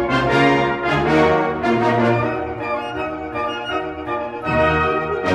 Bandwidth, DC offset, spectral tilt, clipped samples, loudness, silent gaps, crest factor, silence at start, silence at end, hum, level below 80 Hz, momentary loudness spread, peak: 11.5 kHz; under 0.1%; -6.5 dB/octave; under 0.1%; -19 LUFS; none; 16 dB; 0 s; 0 s; none; -40 dBFS; 10 LU; -2 dBFS